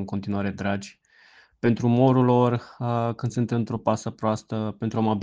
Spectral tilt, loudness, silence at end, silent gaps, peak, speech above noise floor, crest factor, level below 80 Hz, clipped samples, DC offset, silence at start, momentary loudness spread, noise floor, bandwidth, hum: -7.5 dB/octave; -24 LUFS; 0 s; none; -6 dBFS; 32 dB; 18 dB; -60 dBFS; under 0.1%; under 0.1%; 0 s; 10 LU; -55 dBFS; 7.8 kHz; none